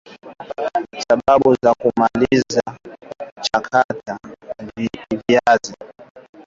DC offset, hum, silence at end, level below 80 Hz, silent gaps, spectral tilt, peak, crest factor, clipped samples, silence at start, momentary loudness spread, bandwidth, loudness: under 0.1%; none; 0.25 s; -52 dBFS; 3.32-3.36 s, 3.84-3.89 s, 6.10-6.15 s; -5 dB/octave; -2 dBFS; 16 dB; under 0.1%; 0.1 s; 20 LU; 7.8 kHz; -18 LUFS